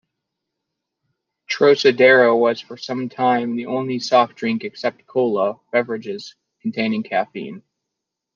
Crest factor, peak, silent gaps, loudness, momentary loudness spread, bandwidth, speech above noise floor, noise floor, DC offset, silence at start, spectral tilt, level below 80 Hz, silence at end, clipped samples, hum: 18 dB; -2 dBFS; none; -19 LUFS; 15 LU; 7.2 kHz; 63 dB; -81 dBFS; under 0.1%; 1.5 s; -5 dB/octave; -72 dBFS; 0.75 s; under 0.1%; none